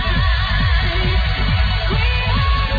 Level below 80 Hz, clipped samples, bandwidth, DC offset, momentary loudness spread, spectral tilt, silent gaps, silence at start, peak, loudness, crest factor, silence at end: -18 dBFS; under 0.1%; 5 kHz; under 0.1%; 1 LU; -7 dB/octave; none; 0 s; -6 dBFS; -18 LUFS; 10 dB; 0 s